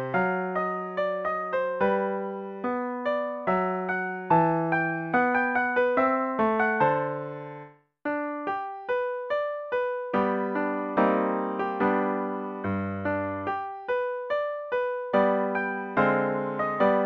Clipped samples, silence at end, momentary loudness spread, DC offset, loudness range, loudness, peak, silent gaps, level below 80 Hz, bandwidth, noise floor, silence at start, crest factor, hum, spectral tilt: under 0.1%; 0 s; 8 LU; under 0.1%; 5 LU; -27 LUFS; -8 dBFS; none; -64 dBFS; 6.2 kHz; -47 dBFS; 0 s; 18 dB; none; -8.5 dB/octave